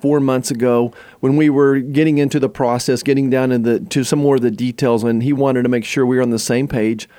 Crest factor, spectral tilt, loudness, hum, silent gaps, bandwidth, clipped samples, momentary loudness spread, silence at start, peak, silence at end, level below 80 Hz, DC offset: 12 dB; -6 dB/octave; -16 LUFS; none; none; 17 kHz; under 0.1%; 4 LU; 0.05 s; -2 dBFS; 0.15 s; -52 dBFS; under 0.1%